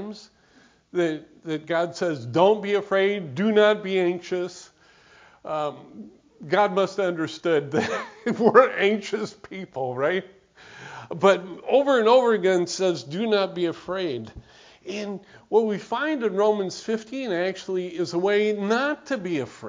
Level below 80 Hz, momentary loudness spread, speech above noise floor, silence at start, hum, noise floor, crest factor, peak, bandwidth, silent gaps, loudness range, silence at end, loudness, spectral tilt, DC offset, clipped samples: -64 dBFS; 16 LU; 34 dB; 0 s; none; -57 dBFS; 22 dB; -2 dBFS; 7.6 kHz; none; 5 LU; 0 s; -23 LUFS; -5.5 dB/octave; under 0.1%; under 0.1%